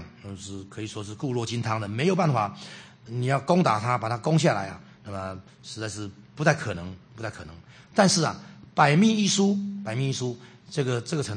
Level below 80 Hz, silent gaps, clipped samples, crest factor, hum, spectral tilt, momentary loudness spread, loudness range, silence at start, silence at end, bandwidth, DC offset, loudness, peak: -62 dBFS; none; under 0.1%; 22 dB; none; -5 dB/octave; 20 LU; 5 LU; 0 s; 0 s; 9.8 kHz; under 0.1%; -25 LUFS; -4 dBFS